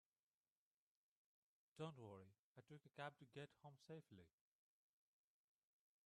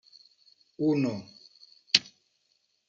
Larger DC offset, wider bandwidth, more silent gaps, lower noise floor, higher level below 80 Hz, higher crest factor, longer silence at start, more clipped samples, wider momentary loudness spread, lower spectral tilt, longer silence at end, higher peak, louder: neither; first, 11 kHz vs 9.2 kHz; first, 2.39-2.55 s vs none; first, under -90 dBFS vs -74 dBFS; second, under -90 dBFS vs -76 dBFS; second, 24 dB vs 30 dB; first, 1.75 s vs 0.8 s; neither; second, 10 LU vs 15 LU; first, -6 dB/octave vs -4 dB/octave; first, 1.75 s vs 0.85 s; second, -38 dBFS vs -2 dBFS; second, -60 LUFS vs -27 LUFS